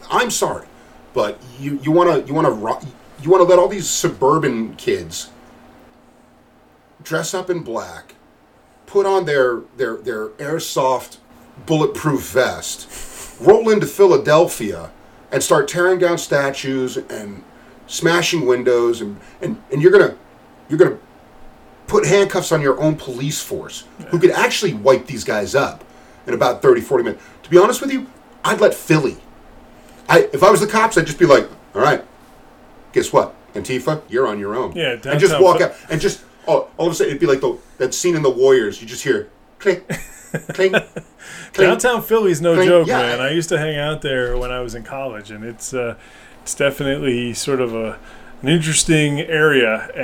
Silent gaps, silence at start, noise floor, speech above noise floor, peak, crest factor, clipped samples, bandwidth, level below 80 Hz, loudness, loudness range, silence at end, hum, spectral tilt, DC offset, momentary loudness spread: none; 0 s; -51 dBFS; 34 dB; 0 dBFS; 18 dB; under 0.1%; 17 kHz; -44 dBFS; -17 LUFS; 7 LU; 0 s; none; -4.5 dB/octave; under 0.1%; 16 LU